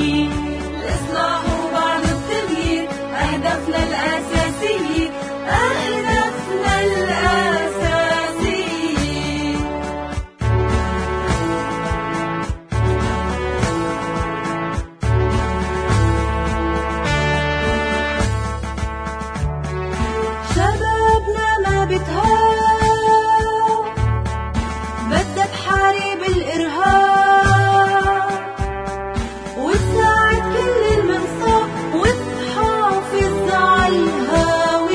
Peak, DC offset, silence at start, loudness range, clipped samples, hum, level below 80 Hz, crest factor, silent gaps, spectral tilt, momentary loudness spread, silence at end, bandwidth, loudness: 0 dBFS; under 0.1%; 0 s; 5 LU; under 0.1%; none; -28 dBFS; 16 dB; none; -5.5 dB/octave; 10 LU; 0 s; 10.5 kHz; -18 LUFS